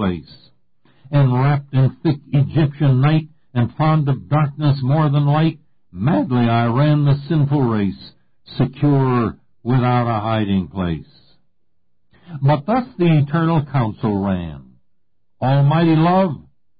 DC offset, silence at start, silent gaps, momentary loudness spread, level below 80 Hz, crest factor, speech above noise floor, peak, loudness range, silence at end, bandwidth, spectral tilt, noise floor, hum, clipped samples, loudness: 0.4%; 0 s; none; 9 LU; -44 dBFS; 10 dB; 55 dB; -8 dBFS; 3 LU; 0.4 s; 4.9 kHz; -13 dB/octave; -71 dBFS; none; under 0.1%; -18 LUFS